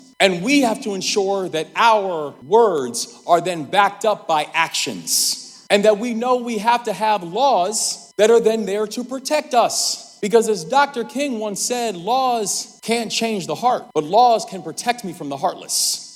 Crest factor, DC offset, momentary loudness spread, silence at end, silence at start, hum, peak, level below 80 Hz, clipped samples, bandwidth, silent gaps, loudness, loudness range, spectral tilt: 18 dB; under 0.1%; 8 LU; 0 s; 0.2 s; none; 0 dBFS; -70 dBFS; under 0.1%; 17.5 kHz; none; -19 LUFS; 2 LU; -2.5 dB/octave